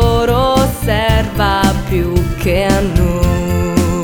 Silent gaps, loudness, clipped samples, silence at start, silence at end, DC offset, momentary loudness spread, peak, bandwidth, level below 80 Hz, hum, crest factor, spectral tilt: none; -14 LUFS; under 0.1%; 0 s; 0 s; 0.5%; 3 LU; 0 dBFS; 20 kHz; -20 dBFS; none; 12 dB; -6 dB/octave